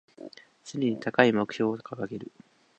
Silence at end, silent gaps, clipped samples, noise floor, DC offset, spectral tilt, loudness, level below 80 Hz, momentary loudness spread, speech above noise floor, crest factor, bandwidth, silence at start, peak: 0.55 s; none; under 0.1%; -47 dBFS; under 0.1%; -6 dB/octave; -27 LUFS; -72 dBFS; 24 LU; 20 dB; 26 dB; 8.8 kHz; 0.2 s; -2 dBFS